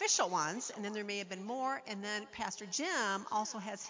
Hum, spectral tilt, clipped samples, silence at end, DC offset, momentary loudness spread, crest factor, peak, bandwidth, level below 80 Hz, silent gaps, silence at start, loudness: none; -1.5 dB/octave; under 0.1%; 0 s; under 0.1%; 8 LU; 18 dB; -20 dBFS; 7.8 kHz; -78 dBFS; none; 0 s; -37 LUFS